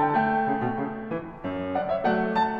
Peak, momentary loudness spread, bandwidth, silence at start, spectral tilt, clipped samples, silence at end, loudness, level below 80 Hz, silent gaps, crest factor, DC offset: -12 dBFS; 10 LU; 6.8 kHz; 0 s; -8.5 dB/octave; under 0.1%; 0 s; -27 LUFS; -54 dBFS; none; 14 dB; under 0.1%